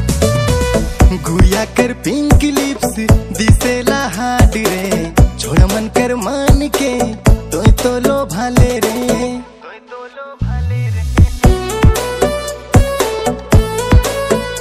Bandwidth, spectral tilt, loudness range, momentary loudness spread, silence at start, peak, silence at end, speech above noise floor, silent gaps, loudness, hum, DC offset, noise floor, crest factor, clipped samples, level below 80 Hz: 15.5 kHz; -5.5 dB/octave; 3 LU; 6 LU; 0 s; 0 dBFS; 0 s; 22 dB; none; -14 LUFS; none; under 0.1%; -35 dBFS; 12 dB; 0.4%; -18 dBFS